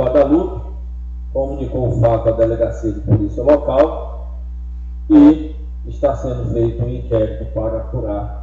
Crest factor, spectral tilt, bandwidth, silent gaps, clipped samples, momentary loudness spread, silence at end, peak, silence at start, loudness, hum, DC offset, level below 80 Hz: 16 dB; -10 dB/octave; 7.2 kHz; none; under 0.1%; 17 LU; 0 s; 0 dBFS; 0 s; -16 LUFS; 60 Hz at -25 dBFS; under 0.1%; -26 dBFS